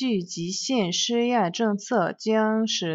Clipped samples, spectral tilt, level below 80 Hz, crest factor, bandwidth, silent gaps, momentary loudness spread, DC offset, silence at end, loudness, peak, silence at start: under 0.1%; -4 dB/octave; -70 dBFS; 14 dB; 8 kHz; none; 5 LU; under 0.1%; 0 s; -24 LUFS; -10 dBFS; 0 s